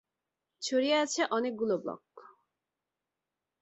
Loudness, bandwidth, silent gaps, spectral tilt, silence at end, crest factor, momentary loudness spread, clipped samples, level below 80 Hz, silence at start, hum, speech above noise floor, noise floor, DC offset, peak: -31 LUFS; 8.4 kHz; none; -3 dB/octave; 1.3 s; 18 dB; 13 LU; under 0.1%; -80 dBFS; 0.6 s; none; 58 dB; -89 dBFS; under 0.1%; -16 dBFS